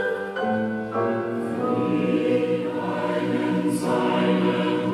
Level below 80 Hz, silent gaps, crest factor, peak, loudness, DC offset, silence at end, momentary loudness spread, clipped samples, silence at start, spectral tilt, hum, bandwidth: -66 dBFS; none; 14 dB; -10 dBFS; -24 LUFS; under 0.1%; 0 s; 5 LU; under 0.1%; 0 s; -6.5 dB/octave; none; 13 kHz